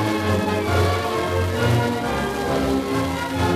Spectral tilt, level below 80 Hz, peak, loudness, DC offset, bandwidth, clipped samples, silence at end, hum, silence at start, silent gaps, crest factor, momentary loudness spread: -6 dB/octave; -38 dBFS; -8 dBFS; -21 LUFS; under 0.1%; 14 kHz; under 0.1%; 0 s; none; 0 s; none; 12 dB; 3 LU